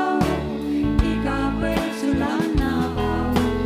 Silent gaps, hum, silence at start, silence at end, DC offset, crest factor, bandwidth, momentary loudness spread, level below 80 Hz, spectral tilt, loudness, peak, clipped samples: none; none; 0 s; 0 s; under 0.1%; 16 dB; 16 kHz; 2 LU; -30 dBFS; -6.5 dB/octave; -22 LUFS; -4 dBFS; under 0.1%